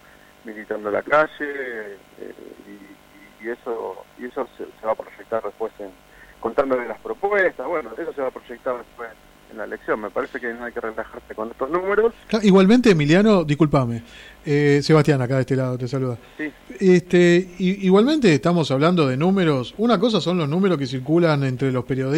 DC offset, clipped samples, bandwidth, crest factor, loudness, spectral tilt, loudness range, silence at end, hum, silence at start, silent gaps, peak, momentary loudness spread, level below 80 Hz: under 0.1%; under 0.1%; 12.5 kHz; 16 dB; -20 LUFS; -7 dB/octave; 12 LU; 0 s; none; 0.45 s; none; -6 dBFS; 17 LU; -52 dBFS